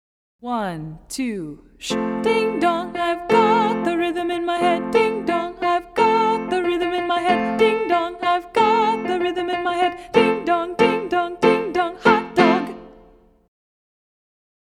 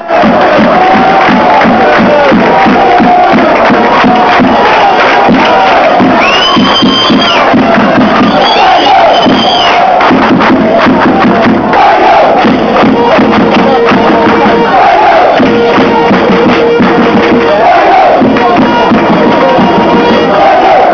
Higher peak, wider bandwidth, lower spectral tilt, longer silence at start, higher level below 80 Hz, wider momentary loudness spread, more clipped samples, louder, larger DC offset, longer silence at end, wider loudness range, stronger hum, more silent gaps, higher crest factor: about the same, -2 dBFS vs 0 dBFS; first, 14 kHz vs 5.4 kHz; about the same, -5 dB/octave vs -6 dB/octave; first, 0.45 s vs 0 s; second, -54 dBFS vs -34 dBFS; first, 9 LU vs 2 LU; neither; second, -20 LUFS vs -4 LUFS; neither; first, 1.8 s vs 0 s; about the same, 2 LU vs 1 LU; neither; neither; first, 20 dB vs 4 dB